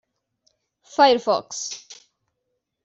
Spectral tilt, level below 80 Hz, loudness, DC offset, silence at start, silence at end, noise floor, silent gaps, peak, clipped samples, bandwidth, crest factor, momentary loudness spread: -2 dB/octave; -70 dBFS; -21 LUFS; under 0.1%; 0.95 s; 0.9 s; -78 dBFS; none; -4 dBFS; under 0.1%; 8 kHz; 22 dB; 15 LU